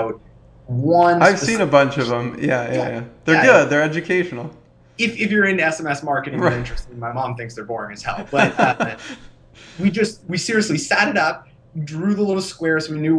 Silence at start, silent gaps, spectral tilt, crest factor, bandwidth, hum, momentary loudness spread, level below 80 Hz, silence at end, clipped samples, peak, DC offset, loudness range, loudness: 0 s; none; -5 dB/octave; 20 dB; 11 kHz; none; 14 LU; -44 dBFS; 0 s; under 0.1%; 0 dBFS; under 0.1%; 6 LU; -18 LUFS